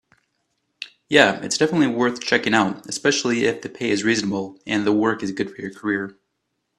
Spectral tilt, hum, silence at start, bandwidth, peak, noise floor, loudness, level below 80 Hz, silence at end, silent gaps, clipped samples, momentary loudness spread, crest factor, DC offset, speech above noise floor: -4 dB/octave; none; 0.8 s; 12 kHz; 0 dBFS; -75 dBFS; -21 LUFS; -62 dBFS; 0.7 s; none; under 0.1%; 11 LU; 22 dB; under 0.1%; 54 dB